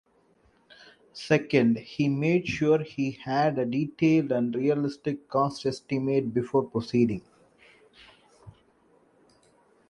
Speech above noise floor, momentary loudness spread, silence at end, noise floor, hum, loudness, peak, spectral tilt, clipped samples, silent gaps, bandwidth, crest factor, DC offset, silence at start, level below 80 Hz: 39 dB; 8 LU; 1.4 s; -64 dBFS; none; -26 LUFS; -8 dBFS; -7 dB/octave; under 0.1%; none; 11 kHz; 20 dB; under 0.1%; 1.15 s; -62 dBFS